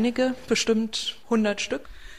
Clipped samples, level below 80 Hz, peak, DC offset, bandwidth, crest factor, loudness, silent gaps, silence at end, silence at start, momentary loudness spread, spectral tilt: under 0.1%; -50 dBFS; -10 dBFS; 0.6%; 14.5 kHz; 16 dB; -25 LUFS; none; 0 s; 0 s; 7 LU; -3.5 dB/octave